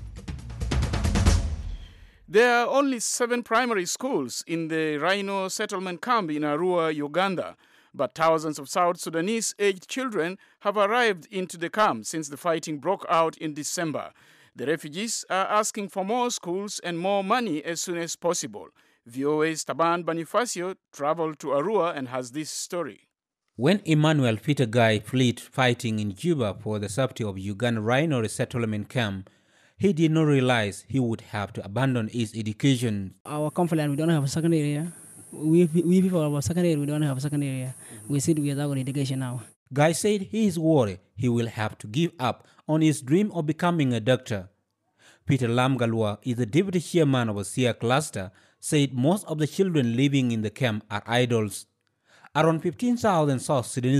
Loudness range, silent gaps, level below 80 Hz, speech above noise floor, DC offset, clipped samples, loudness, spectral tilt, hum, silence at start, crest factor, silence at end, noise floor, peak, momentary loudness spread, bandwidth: 3 LU; 33.20-33.25 s, 39.56-39.66 s; -44 dBFS; 50 dB; under 0.1%; under 0.1%; -25 LUFS; -5.5 dB/octave; none; 0 s; 18 dB; 0 s; -75 dBFS; -6 dBFS; 10 LU; 15.5 kHz